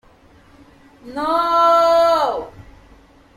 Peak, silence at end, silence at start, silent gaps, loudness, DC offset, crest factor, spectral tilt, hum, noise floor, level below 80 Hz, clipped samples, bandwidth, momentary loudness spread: -4 dBFS; 0.9 s; 1.05 s; none; -16 LUFS; under 0.1%; 14 dB; -4 dB/octave; none; -49 dBFS; -50 dBFS; under 0.1%; 16 kHz; 17 LU